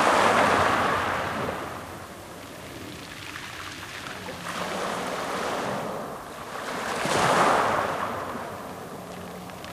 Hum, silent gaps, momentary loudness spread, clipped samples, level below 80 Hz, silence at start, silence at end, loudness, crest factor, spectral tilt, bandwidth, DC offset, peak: none; none; 18 LU; under 0.1%; -56 dBFS; 0 s; 0 s; -26 LUFS; 20 dB; -3.5 dB/octave; 16 kHz; under 0.1%; -6 dBFS